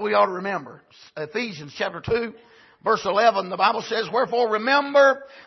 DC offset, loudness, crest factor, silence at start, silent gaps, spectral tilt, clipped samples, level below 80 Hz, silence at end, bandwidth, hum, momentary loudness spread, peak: under 0.1%; -22 LUFS; 18 dB; 0 s; none; -4.5 dB/octave; under 0.1%; -58 dBFS; 0.05 s; 6.2 kHz; none; 13 LU; -4 dBFS